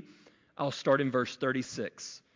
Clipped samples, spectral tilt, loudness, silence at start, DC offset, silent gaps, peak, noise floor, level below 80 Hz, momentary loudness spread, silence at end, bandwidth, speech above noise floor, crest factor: under 0.1%; -5 dB/octave; -31 LUFS; 0 s; under 0.1%; none; -12 dBFS; -60 dBFS; -74 dBFS; 13 LU; 0.2 s; 7.6 kHz; 28 dB; 20 dB